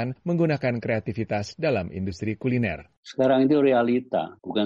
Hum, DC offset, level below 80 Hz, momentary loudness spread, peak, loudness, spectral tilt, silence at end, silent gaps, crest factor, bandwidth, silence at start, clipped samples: none; under 0.1%; -56 dBFS; 10 LU; -10 dBFS; -24 LUFS; -7.5 dB/octave; 0 s; 2.97-3.03 s; 14 dB; 7.6 kHz; 0 s; under 0.1%